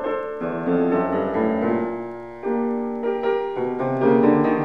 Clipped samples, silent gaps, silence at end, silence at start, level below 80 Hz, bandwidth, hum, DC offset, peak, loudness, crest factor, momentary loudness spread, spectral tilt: under 0.1%; none; 0 s; 0 s; -58 dBFS; 5.4 kHz; none; 0.3%; -4 dBFS; -22 LUFS; 16 dB; 10 LU; -9.5 dB/octave